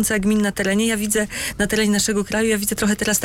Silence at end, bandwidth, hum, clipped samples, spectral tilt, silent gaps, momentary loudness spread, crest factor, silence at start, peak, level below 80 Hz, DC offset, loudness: 0 s; 16.5 kHz; none; under 0.1%; -3.5 dB/octave; none; 3 LU; 14 dB; 0 s; -6 dBFS; -40 dBFS; under 0.1%; -19 LUFS